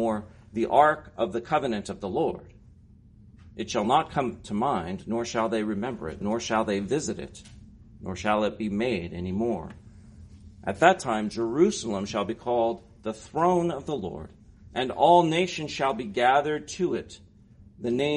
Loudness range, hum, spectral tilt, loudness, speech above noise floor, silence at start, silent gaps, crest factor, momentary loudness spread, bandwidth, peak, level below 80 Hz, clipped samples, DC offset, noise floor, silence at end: 5 LU; none; -5 dB/octave; -27 LUFS; 27 dB; 0 s; none; 22 dB; 15 LU; 10.5 kHz; -4 dBFS; -54 dBFS; under 0.1%; under 0.1%; -53 dBFS; 0 s